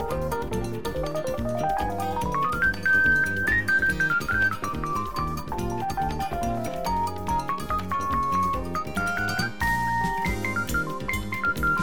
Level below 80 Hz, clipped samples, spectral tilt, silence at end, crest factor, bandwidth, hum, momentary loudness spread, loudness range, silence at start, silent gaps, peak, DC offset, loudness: -38 dBFS; under 0.1%; -5 dB/octave; 0 s; 14 dB; over 20 kHz; none; 8 LU; 5 LU; 0 s; none; -12 dBFS; 1%; -26 LUFS